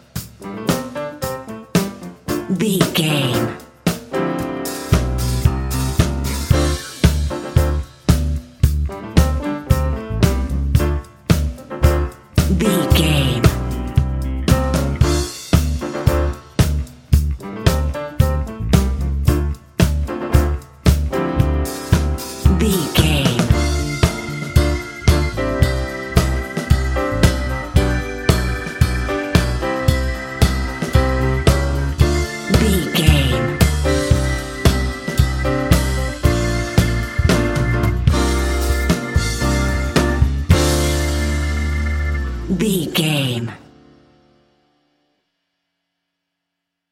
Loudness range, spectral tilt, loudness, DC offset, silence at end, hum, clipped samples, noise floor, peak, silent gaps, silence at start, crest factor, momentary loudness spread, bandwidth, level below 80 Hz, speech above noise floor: 3 LU; -5.5 dB/octave; -18 LUFS; under 0.1%; 3.35 s; none; under 0.1%; -79 dBFS; 0 dBFS; none; 0.15 s; 18 dB; 7 LU; 17 kHz; -22 dBFS; 62 dB